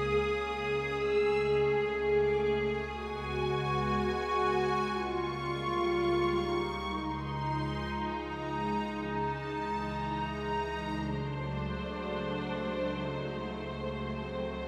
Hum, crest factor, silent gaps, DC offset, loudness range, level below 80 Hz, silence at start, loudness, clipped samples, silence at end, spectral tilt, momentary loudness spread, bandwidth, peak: none; 14 dB; none; under 0.1%; 5 LU; -48 dBFS; 0 s; -33 LUFS; under 0.1%; 0 s; -6.5 dB/octave; 8 LU; 10.5 kHz; -20 dBFS